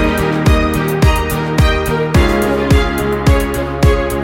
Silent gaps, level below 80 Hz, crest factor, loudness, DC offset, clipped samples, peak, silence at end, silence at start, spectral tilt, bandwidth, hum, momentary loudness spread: none; -18 dBFS; 12 dB; -14 LUFS; under 0.1%; under 0.1%; 0 dBFS; 0 s; 0 s; -6 dB/octave; 17 kHz; none; 3 LU